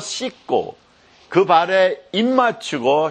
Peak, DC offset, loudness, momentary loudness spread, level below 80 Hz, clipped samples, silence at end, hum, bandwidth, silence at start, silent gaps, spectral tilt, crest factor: -2 dBFS; under 0.1%; -18 LUFS; 10 LU; -66 dBFS; under 0.1%; 0 s; none; 10 kHz; 0 s; none; -4 dB/octave; 18 dB